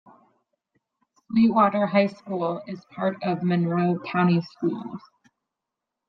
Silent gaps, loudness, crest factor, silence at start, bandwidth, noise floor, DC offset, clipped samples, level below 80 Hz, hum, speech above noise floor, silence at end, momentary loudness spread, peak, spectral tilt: none; -24 LUFS; 20 dB; 1.3 s; 5.8 kHz; -85 dBFS; under 0.1%; under 0.1%; -68 dBFS; none; 62 dB; 1.1 s; 14 LU; -6 dBFS; -9.5 dB/octave